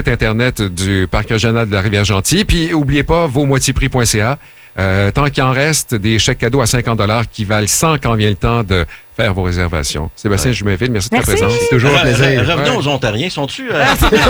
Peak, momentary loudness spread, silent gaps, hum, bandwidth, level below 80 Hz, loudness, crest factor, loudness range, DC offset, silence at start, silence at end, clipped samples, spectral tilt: 0 dBFS; 6 LU; none; none; over 20 kHz; -26 dBFS; -13 LUFS; 12 dB; 2 LU; under 0.1%; 0 s; 0 s; under 0.1%; -4.5 dB/octave